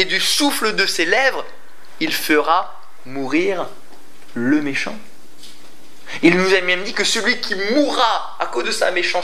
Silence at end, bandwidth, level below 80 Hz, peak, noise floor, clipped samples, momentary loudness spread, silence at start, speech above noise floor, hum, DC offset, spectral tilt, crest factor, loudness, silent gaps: 0 s; 15.5 kHz; -70 dBFS; 0 dBFS; -46 dBFS; under 0.1%; 14 LU; 0 s; 28 dB; none; 5%; -3 dB/octave; 20 dB; -17 LUFS; none